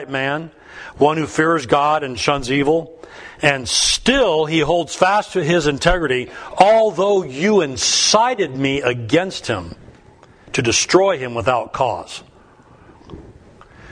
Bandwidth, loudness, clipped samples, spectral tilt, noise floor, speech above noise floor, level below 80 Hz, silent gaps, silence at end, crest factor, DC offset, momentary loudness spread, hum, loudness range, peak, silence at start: 11 kHz; -17 LUFS; under 0.1%; -3.5 dB/octave; -47 dBFS; 30 dB; -40 dBFS; none; 0 s; 18 dB; under 0.1%; 12 LU; none; 4 LU; 0 dBFS; 0 s